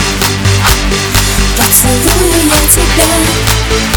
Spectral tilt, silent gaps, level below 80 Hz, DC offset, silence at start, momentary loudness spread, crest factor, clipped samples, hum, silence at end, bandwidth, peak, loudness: -3 dB/octave; none; -16 dBFS; under 0.1%; 0 s; 4 LU; 8 dB; 0.5%; none; 0 s; over 20 kHz; 0 dBFS; -8 LUFS